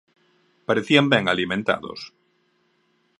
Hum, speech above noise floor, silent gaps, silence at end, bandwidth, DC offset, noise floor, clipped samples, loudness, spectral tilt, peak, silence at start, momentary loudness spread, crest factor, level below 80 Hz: none; 45 dB; none; 1.1 s; 11 kHz; under 0.1%; -66 dBFS; under 0.1%; -20 LUFS; -5.5 dB/octave; 0 dBFS; 0.7 s; 20 LU; 24 dB; -60 dBFS